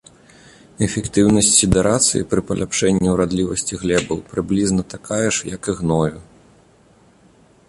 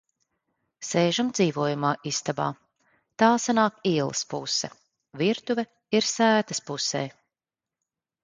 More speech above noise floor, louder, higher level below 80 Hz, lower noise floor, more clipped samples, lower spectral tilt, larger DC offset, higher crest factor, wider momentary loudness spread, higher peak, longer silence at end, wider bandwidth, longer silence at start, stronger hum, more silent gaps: second, 34 dB vs over 65 dB; first, -18 LUFS vs -25 LUFS; first, -38 dBFS vs -70 dBFS; second, -52 dBFS vs under -90 dBFS; neither; about the same, -4 dB/octave vs -4 dB/octave; neither; about the same, 20 dB vs 22 dB; about the same, 10 LU vs 8 LU; first, 0 dBFS vs -6 dBFS; first, 1.45 s vs 1.15 s; first, 11.5 kHz vs 9.6 kHz; about the same, 0.8 s vs 0.8 s; neither; neither